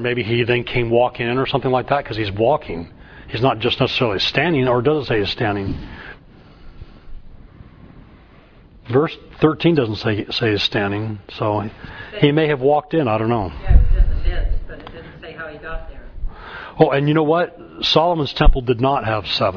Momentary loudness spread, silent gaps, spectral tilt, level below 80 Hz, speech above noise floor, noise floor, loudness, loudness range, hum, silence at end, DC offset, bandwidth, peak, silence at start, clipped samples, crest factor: 17 LU; none; -7 dB/octave; -24 dBFS; 29 dB; -46 dBFS; -18 LUFS; 6 LU; none; 0 s; under 0.1%; 5.4 kHz; 0 dBFS; 0 s; under 0.1%; 18 dB